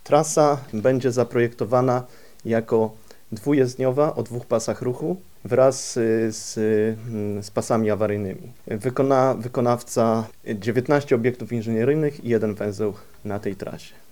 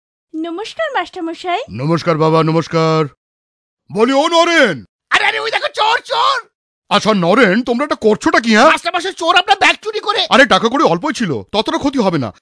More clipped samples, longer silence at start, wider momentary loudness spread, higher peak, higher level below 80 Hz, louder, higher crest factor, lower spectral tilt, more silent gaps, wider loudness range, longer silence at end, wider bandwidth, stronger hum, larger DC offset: neither; second, 0.05 s vs 0.35 s; about the same, 11 LU vs 11 LU; second, -4 dBFS vs 0 dBFS; second, -58 dBFS vs -52 dBFS; second, -23 LUFS vs -13 LUFS; first, 20 dB vs 14 dB; first, -6 dB/octave vs -4.5 dB/octave; second, none vs 3.17-3.77 s, 4.89-4.99 s, 6.55-6.82 s; second, 2 LU vs 5 LU; first, 0.25 s vs 0.1 s; first, 19.5 kHz vs 11 kHz; neither; first, 0.6% vs under 0.1%